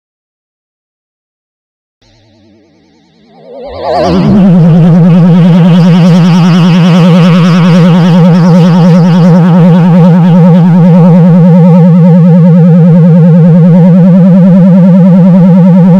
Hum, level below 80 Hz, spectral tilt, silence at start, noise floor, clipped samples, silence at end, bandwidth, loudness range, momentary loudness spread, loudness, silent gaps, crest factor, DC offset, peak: none; -38 dBFS; -9 dB/octave; 3.5 s; -44 dBFS; 20%; 0 s; 6.4 kHz; 5 LU; 1 LU; -3 LUFS; none; 2 dB; under 0.1%; 0 dBFS